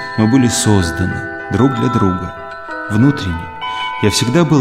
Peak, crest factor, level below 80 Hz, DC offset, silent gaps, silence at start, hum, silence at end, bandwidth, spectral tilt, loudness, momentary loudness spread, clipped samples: 0 dBFS; 14 dB; -38 dBFS; under 0.1%; none; 0 s; none; 0 s; 15.5 kHz; -5 dB/octave; -15 LUFS; 11 LU; under 0.1%